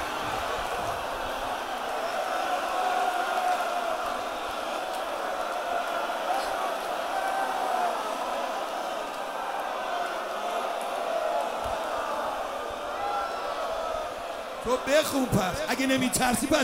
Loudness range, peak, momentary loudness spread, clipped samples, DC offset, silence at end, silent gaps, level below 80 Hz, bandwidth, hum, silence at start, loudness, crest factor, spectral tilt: 3 LU; -10 dBFS; 7 LU; under 0.1%; under 0.1%; 0 s; none; -54 dBFS; 16 kHz; none; 0 s; -29 LUFS; 20 dB; -3.5 dB/octave